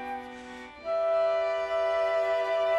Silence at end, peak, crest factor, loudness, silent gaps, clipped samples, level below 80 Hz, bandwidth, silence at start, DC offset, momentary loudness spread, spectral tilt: 0 s; -18 dBFS; 12 dB; -28 LUFS; none; under 0.1%; -64 dBFS; 9 kHz; 0 s; under 0.1%; 15 LU; -3.5 dB/octave